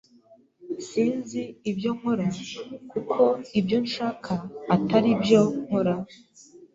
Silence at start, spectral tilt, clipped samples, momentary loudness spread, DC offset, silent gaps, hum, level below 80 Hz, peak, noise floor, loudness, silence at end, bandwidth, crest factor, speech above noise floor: 0.65 s; -6.5 dB/octave; under 0.1%; 14 LU; under 0.1%; none; none; -62 dBFS; -6 dBFS; -57 dBFS; -25 LUFS; 0.1 s; 7.8 kHz; 20 dB; 32 dB